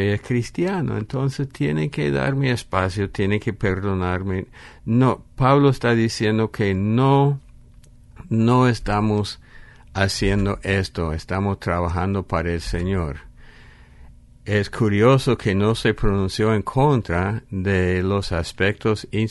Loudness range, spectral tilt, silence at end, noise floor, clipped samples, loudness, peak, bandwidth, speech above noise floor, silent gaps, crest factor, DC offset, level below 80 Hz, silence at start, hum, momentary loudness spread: 4 LU; -7 dB/octave; 0 s; -47 dBFS; under 0.1%; -21 LUFS; -2 dBFS; 11.5 kHz; 26 dB; none; 18 dB; under 0.1%; -38 dBFS; 0 s; none; 8 LU